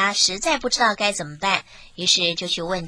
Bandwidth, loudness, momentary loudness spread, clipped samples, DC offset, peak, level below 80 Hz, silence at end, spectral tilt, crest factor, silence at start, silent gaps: 10.5 kHz; -20 LUFS; 7 LU; under 0.1%; under 0.1%; 0 dBFS; -50 dBFS; 0 s; -1.5 dB/octave; 22 dB; 0 s; none